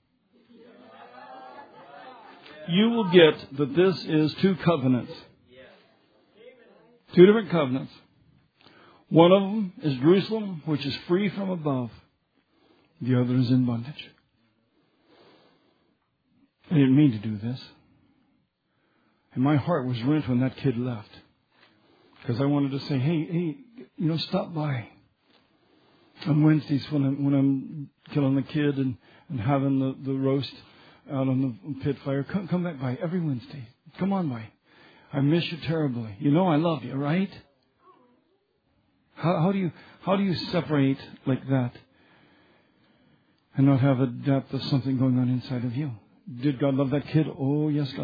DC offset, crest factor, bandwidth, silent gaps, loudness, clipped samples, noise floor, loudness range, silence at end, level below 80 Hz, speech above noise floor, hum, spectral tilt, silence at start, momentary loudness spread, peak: under 0.1%; 24 dB; 5 kHz; none; -25 LUFS; under 0.1%; -72 dBFS; 6 LU; 0 s; -66 dBFS; 48 dB; none; -9.5 dB/octave; 1 s; 17 LU; -2 dBFS